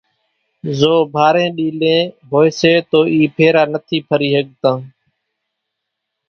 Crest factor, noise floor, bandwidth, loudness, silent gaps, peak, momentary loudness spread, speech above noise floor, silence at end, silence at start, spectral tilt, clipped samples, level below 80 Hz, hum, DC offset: 16 dB; -77 dBFS; 6.8 kHz; -14 LUFS; none; 0 dBFS; 6 LU; 63 dB; 1.4 s; 0.65 s; -6 dB/octave; under 0.1%; -58 dBFS; none; under 0.1%